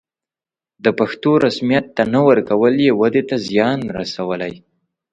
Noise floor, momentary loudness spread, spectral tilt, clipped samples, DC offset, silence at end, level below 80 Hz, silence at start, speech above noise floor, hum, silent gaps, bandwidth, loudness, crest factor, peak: under -90 dBFS; 9 LU; -6.5 dB/octave; under 0.1%; under 0.1%; 0.55 s; -56 dBFS; 0.85 s; over 74 dB; none; none; 8.8 kHz; -16 LUFS; 16 dB; 0 dBFS